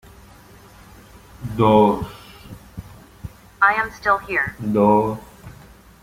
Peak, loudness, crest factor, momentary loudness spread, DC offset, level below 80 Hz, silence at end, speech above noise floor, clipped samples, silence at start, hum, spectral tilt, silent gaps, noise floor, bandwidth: -2 dBFS; -18 LUFS; 20 dB; 24 LU; under 0.1%; -46 dBFS; 0.5 s; 28 dB; under 0.1%; 1.4 s; none; -7 dB/octave; none; -46 dBFS; 16 kHz